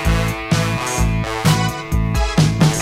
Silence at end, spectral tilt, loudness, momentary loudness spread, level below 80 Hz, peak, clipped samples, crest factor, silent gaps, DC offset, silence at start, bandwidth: 0 s; -5 dB/octave; -18 LUFS; 5 LU; -24 dBFS; -2 dBFS; under 0.1%; 14 dB; none; under 0.1%; 0 s; 16 kHz